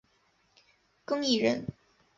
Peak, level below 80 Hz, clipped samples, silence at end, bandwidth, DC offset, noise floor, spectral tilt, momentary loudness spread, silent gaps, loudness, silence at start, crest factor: -12 dBFS; -66 dBFS; under 0.1%; 0.45 s; 7.8 kHz; under 0.1%; -70 dBFS; -4 dB/octave; 18 LU; none; -29 LUFS; 1.1 s; 20 dB